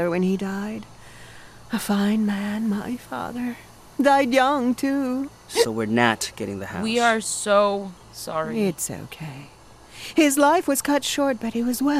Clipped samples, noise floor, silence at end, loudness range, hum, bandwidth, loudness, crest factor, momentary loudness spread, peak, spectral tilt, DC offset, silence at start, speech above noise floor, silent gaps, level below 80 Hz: under 0.1%; -44 dBFS; 0 s; 4 LU; none; 15.5 kHz; -22 LUFS; 20 dB; 15 LU; -2 dBFS; -4 dB/octave; under 0.1%; 0 s; 21 dB; none; -56 dBFS